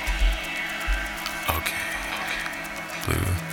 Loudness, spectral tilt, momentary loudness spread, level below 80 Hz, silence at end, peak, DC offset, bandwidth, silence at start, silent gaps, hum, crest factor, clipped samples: -27 LUFS; -3.5 dB/octave; 5 LU; -32 dBFS; 0 s; -6 dBFS; under 0.1%; over 20 kHz; 0 s; none; none; 22 dB; under 0.1%